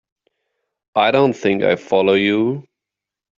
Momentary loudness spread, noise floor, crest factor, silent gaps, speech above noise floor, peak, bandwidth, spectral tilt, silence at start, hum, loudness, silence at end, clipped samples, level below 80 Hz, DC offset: 8 LU; -86 dBFS; 18 dB; none; 70 dB; 0 dBFS; 7.4 kHz; -6.5 dB/octave; 0.95 s; none; -17 LUFS; 0.75 s; under 0.1%; -60 dBFS; under 0.1%